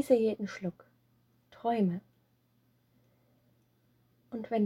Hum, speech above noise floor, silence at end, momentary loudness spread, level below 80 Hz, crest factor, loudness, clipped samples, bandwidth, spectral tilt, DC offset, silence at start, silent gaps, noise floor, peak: none; 40 dB; 0 s; 15 LU; -76 dBFS; 22 dB; -33 LUFS; under 0.1%; 16 kHz; -7.5 dB/octave; under 0.1%; 0 s; none; -71 dBFS; -12 dBFS